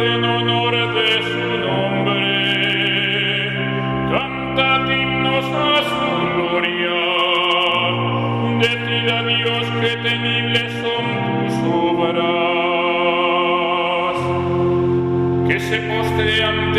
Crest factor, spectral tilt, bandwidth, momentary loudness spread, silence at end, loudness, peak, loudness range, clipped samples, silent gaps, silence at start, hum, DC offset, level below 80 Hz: 16 dB; -6 dB/octave; 13.5 kHz; 4 LU; 0 s; -17 LUFS; -2 dBFS; 1 LU; under 0.1%; none; 0 s; none; under 0.1%; -46 dBFS